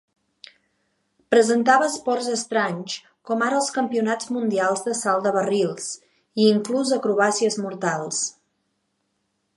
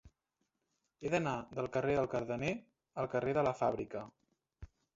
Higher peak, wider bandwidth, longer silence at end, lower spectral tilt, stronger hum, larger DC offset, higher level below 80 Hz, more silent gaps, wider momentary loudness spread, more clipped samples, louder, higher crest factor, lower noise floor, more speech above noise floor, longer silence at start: first, -2 dBFS vs -18 dBFS; first, 11.5 kHz vs 7.6 kHz; first, 1.25 s vs 0.3 s; second, -3.5 dB/octave vs -5.5 dB/octave; neither; neither; second, -76 dBFS vs -64 dBFS; neither; about the same, 11 LU vs 12 LU; neither; first, -22 LUFS vs -37 LUFS; about the same, 20 dB vs 20 dB; second, -73 dBFS vs -85 dBFS; about the same, 52 dB vs 49 dB; first, 1.3 s vs 0.05 s